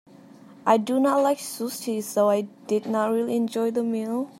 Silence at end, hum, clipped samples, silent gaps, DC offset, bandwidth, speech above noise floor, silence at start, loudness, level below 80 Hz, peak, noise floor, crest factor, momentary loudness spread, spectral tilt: 0.1 s; none; under 0.1%; none; under 0.1%; 16.5 kHz; 25 dB; 0.3 s; -24 LUFS; -82 dBFS; -6 dBFS; -48 dBFS; 20 dB; 8 LU; -5 dB/octave